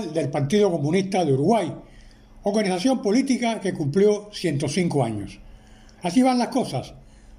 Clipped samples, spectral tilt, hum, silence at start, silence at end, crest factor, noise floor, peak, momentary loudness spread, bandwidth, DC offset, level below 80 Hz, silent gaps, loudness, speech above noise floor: under 0.1%; -6 dB/octave; none; 0 s; 0 s; 16 dB; -47 dBFS; -6 dBFS; 11 LU; 15 kHz; under 0.1%; -52 dBFS; none; -22 LUFS; 25 dB